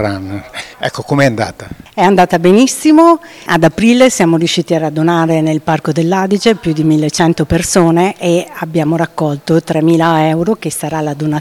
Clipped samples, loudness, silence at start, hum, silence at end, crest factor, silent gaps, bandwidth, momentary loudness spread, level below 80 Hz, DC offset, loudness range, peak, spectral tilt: under 0.1%; -12 LUFS; 0 s; none; 0 s; 12 dB; none; 16 kHz; 10 LU; -40 dBFS; under 0.1%; 3 LU; 0 dBFS; -5.5 dB/octave